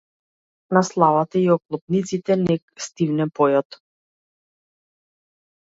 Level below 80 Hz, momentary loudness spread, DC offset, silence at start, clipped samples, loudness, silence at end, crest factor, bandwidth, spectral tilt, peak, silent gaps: -64 dBFS; 7 LU; under 0.1%; 0.7 s; under 0.1%; -20 LUFS; 2.15 s; 22 dB; 8 kHz; -6.5 dB/octave; 0 dBFS; 1.82-1.87 s, 2.62-2.68 s